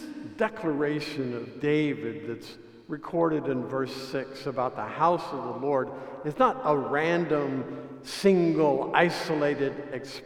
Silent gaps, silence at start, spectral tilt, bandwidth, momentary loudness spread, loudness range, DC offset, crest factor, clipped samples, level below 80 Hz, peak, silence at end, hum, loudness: none; 0 s; -6.5 dB/octave; 15 kHz; 13 LU; 5 LU; under 0.1%; 22 dB; under 0.1%; -64 dBFS; -6 dBFS; 0 s; none; -28 LUFS